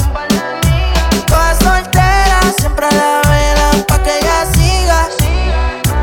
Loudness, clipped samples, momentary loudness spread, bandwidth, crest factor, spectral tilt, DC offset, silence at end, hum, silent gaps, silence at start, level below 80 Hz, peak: -12 LUFS; under 0.1%; 4 LU; 19 kHz; 10 dB; -4.5 dB/octave; under 0.1%; 0 s; none; none; 0 s; -14 dBFS; 0 dBFS